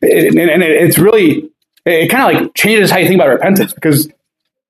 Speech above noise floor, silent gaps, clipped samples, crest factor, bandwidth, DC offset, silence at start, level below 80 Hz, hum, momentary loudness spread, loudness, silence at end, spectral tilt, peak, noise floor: 64 dB; none; under 0.1%; 10 dB; 16 kHz; under 0.1%; 0 s; -52 dBFS; none; 6 LU; -10 LUFS; 0.6 s; -5 dB/octave; 0 dBFS; -73 dBFS